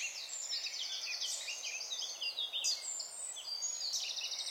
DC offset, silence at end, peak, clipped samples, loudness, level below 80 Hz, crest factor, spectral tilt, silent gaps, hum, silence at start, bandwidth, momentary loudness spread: under 0.1%; 0 s; -22 dBFS; under 0.1%; -37 LUFS; under -90 dBFS; 18 dB; 4.5 dB/octave; none; none; 0 s; 16.5 kHz; 5 LU